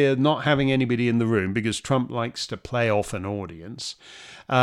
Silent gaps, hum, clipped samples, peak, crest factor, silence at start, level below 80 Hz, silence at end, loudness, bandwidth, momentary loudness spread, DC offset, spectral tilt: none; none; under 0.1%; -6 dBFS; 18 dB; 0 s; -54 dBFS; 0 s; -24 LUFS; 13 kHz; 13 LU; under 0.1%; -6 dB/octave